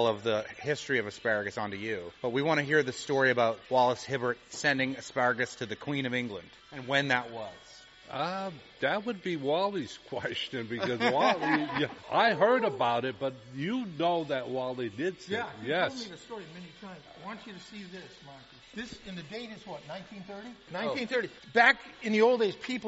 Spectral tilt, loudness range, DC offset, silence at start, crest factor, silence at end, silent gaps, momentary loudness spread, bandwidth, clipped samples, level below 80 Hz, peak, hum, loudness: -2.5 dB/octave; 13 LU; under 0.1%; 0 s; 24 dB; 0 s; none; 19 LU; 8 kHz; under 0.1%; -68 dBFS; -8 dBFS; none; -30 LUFS